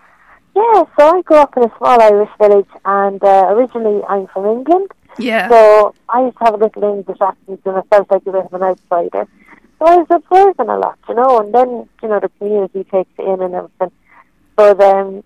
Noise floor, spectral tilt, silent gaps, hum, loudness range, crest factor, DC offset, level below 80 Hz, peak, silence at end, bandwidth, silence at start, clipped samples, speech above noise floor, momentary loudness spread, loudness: -48 dBFS; -6 dB/octave; none; none; 5 LU; 12 dB; 0.2%; -56 dBFS; 0 dBFS; 0.05 s; 12 kHz; 0.55 s; under 0.1%; 37 dB; 12 LU; -12 LUFS